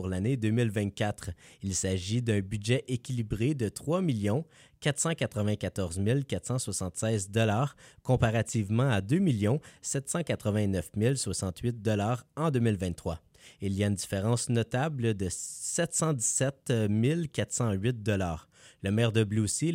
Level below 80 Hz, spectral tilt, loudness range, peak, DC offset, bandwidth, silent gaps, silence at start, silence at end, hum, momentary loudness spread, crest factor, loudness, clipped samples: -54 dBFS; -5.5 dB/octave; 2 LU; -12 dBFS; under 0.1%; 16 kHz; none; 0 s; 0 s; none; 7 LU; 18 dB; -30 LUFS; under 0.1%